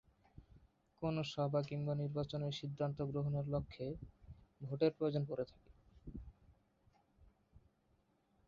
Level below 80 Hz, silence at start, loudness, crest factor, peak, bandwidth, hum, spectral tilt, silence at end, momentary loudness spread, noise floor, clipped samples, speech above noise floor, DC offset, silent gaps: -64 dBFS; 0.4 s; -41 LUFS; 22 dB; -22 dBFS; 7.4 kHz; none; -7 dB/octave; 0.9 s; 18 LU; -77 dBFS; under 0.1%; 37 dB; under 0.1%; none